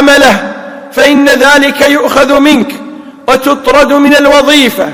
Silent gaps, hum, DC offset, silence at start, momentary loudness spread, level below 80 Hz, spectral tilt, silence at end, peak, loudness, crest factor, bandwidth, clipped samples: none; none; under 0.1%; 0 s; 14 LU; -36 dBFS; -3 dB/octave; 0 s; 0 dBFS; -5 LUFS; 6 dB; 19.5 kHz; 10%